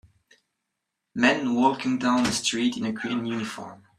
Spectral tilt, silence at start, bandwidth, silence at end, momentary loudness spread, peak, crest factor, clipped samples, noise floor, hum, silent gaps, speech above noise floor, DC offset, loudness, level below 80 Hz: -3.5 dB/octave; 1.15 s; 13 kHz; 0.25 s; 10 LU; -4 dBFS; 22 dB; under 0.1%; -82 dBFS; none; none; 58 dB; under 0.1%; -24 LUFS; -62 dBFS